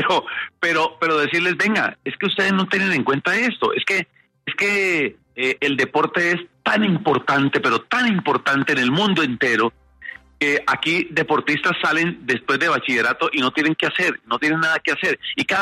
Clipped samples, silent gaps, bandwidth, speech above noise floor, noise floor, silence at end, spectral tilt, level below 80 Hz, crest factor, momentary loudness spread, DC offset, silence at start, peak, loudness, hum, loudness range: under 0.1%; none; 13.5 kHz; 19 dB; -39 dBFS; 0 s; -4.5 dB/octave; -62 dBFS; 14 dB; 5 LU; under 0.1%; 0 s; -6 dBFS; -19 LUFS; none; 1 LU